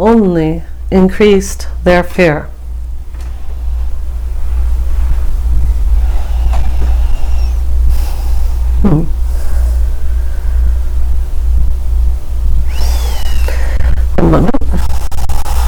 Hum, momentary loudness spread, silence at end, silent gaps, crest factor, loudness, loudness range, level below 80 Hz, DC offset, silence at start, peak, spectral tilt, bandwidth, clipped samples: none; 11 LU; 0 s; none; 10 dB; -14 LUFS; 4 LU; -12 dBFS; under 0.1%; 0 s; 0 dBFS; -7 dB/octave; 14.5 kHz; 0.5%